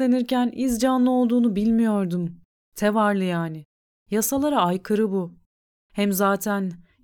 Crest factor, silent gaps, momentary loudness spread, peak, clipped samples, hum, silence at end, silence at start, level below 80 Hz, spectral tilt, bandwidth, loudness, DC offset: 14 dB; 2.45-2.72 s, 3.65-4.06 s, 5.46-5.90 s; 12 LU; -8 dBFS; under 0.1%; none; 0.25 s; 0 s; -54 dBFS; -5.5 dB/octave; 19.5 kHz; -22 LUFS; under 0.1%